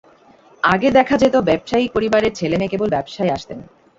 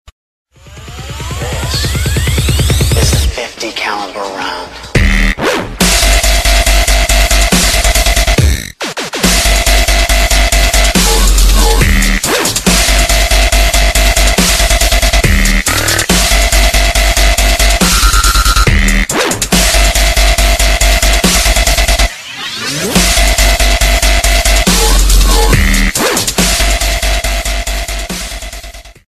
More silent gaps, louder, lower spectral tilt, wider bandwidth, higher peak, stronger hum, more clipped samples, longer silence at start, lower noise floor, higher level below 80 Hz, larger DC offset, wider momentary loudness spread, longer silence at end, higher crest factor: neither; second, -17 LUFS vs -10 LUFS; first, -6 dB/octave vs -3 dB/octave; second, 7.8 kHz vs 14.5 kHz; about the same, -2 dBFS vs 0 dBFS; neither; second, under 0.1% vs 0.1%; about the same, 0.65 s vs 0.7 s; first, -49 dBFS vs -31 dBFS; second, -48 dBFS vs -12 dBFS; neither; about the same, 8 LU vs 9 LU; first, 0.35 s vs 0.15 s; first, 16 dB vs 10 dB